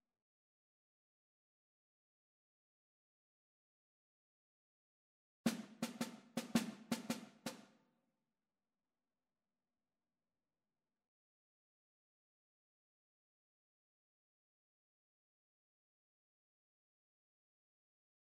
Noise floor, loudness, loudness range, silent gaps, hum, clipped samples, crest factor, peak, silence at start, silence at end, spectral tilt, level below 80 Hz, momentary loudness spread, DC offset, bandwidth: under -90 dBFS; -45 LUFS; 7 LU; none; none; under 0.1%; 30 dB; -22 dBFS; 5.45 s; 10.7 s; -4 dB/octave; -88 dBFS; 10 LU; under 0.1%; 15 kHz